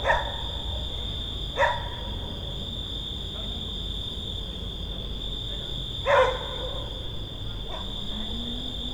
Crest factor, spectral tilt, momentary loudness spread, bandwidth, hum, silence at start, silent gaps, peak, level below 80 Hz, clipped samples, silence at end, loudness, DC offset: 22 dB; -4.5 dB/octave; 9 LU; over 20 kHz; none; 0 s; none; -8 dBFS; -36 dBFS; under 0.1%; 0 s; -30 LUFS; under 0.1%